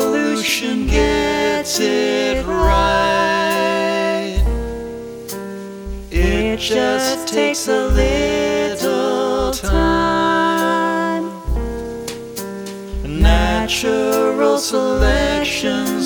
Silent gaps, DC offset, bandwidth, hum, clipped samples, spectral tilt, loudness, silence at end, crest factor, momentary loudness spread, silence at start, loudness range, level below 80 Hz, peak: none; under 0.1%; over 20 kHz; none; under 0.1%; -4.5 dB/octave; -17 LUFS; 0 s; 16 dB; 12 LU; 0 s; 4 LU; -24 dBFS; -2 dBFS